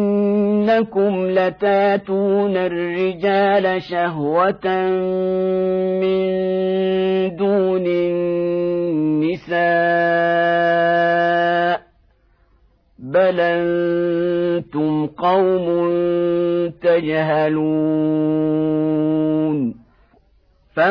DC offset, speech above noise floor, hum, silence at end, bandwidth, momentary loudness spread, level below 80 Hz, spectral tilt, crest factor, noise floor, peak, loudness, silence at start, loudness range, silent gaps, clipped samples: under 0.1%; 39 dB; none; 0 s; 5.4 kHz; 4 LU; -56 dBFS; -9 dB/octave; 12 dB; -56 dBFS; -4 dBFS; -18 LUFS; 0 s; 2 LU; none; under 0.1%